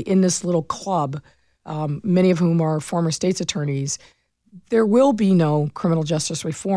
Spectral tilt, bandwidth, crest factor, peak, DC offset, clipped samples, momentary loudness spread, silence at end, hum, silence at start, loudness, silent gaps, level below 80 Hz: -6 dB/octave; 11 kHz; 14 dB; -6 dBFS; under 0.1%; under 0.1%; 11 LU; 0 s; none; 0 s; -20 LUFS; none; -58 dBFS